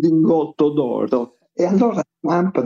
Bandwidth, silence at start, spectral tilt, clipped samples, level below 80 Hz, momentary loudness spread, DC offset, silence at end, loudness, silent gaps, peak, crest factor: 7.2 kHz; 0 s; -8.5 dB/octave; under 0.1%; -66 dBFS; 7 LU; under 0.1%; 0 s; -19 LUFS; none; -6 dBFS; 12 dB